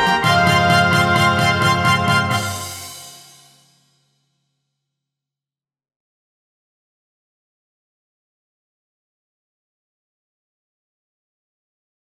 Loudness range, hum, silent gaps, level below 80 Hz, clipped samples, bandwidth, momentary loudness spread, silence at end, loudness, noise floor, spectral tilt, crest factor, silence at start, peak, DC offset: 18 LU; none; none; -50 dBFS; under 0.1%; 16.5 kHz; 16 LU; 9 s; -15 LUFS; under -90 dBFS; -4.5 dB/octave; 20 dB; 0 s; 0 dBFS; under 0.1%